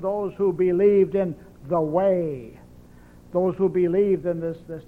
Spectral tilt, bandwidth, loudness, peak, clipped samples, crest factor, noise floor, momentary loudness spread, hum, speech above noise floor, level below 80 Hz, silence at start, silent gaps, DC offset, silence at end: -10 dB/octave; 3.7 kHz; -23 LUFS; -8 dBFS; under 0.1%; 14 dB; -48 dBFS; 12 LU; none; 26 dB; -52 dBFS; 0 s; none; under 0.1%; 0.05 s